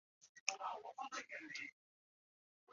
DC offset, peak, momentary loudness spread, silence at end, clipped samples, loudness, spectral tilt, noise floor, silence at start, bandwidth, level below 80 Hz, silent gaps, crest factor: under 0.1%; -16 dBFS; 8 LU; 0 s; under 0.1%; -47 LUFS; 2 dB/octave; under -90 dBFS; 0.2 s; 7.4 kHz; under -90 dBFS; 0.29-0.46 s, 1.72-2.67 s; 36 dB